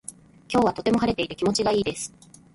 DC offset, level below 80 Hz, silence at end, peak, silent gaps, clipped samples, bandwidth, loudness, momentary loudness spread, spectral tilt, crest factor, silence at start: under 0.1%; -52 dBFS; 0.45 s; -10 dBFS; none; under 0.1%; 11.5 kHz; -24 LUFS; 12 LU; -4.5 dB/octave; 16 dB; 0.1 s